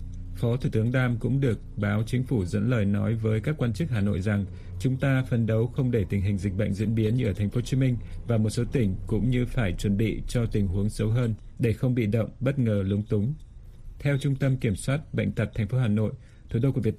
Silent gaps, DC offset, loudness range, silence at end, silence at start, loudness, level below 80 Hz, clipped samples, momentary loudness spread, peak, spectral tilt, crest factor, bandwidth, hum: none; under 0.1%; 1 LU; 0 s; 0 s; -27 LUFS; -40 dBFS; under 0.1%; 4 LU; -12 dBFS; -8 dB/octave; 14 dB; 13 kHz; none